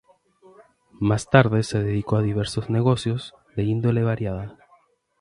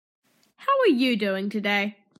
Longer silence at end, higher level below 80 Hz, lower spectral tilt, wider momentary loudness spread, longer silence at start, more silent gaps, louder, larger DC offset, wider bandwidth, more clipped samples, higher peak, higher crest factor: first, 0.65 s vs 0.3 s; first, -48 dBFS vs -82 dBFS; first, -7 dB/octave vs -5.5 dB/octave; first, 12 LU vs 6 LU; first, 1 s vs 0.6 s; neither; about the same, -23 LUFS vs -23 LUFS; neither; second, 11.5 kHz vs 14 kHz; neither; first, 0 dBFS vs -10 dBFS; first, 22 dB vs 14 dB